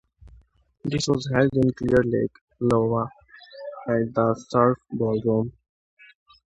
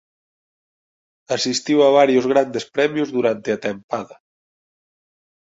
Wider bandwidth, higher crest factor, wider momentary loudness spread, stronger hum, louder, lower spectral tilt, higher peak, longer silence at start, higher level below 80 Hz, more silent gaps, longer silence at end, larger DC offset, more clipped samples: first, 11 kHz vs 8 kHz; about the same, 20 dB vs 18 dB; about the same, 13 LU vs 14 LU; neither; second, -23 LUFS vs -19 LUFS; first, -6.5 dB/octave vs -4 dB/octave; about the same, -4 dBFS vs -2 dBFS; second, 0.85 s vs 1.3 s; first, -50 dBFS vs -64 dBFS; about the same, 2.41-2.48 s vs 3.84-3.89 s; second, 1.05 s vs 1.45 s; neither; neither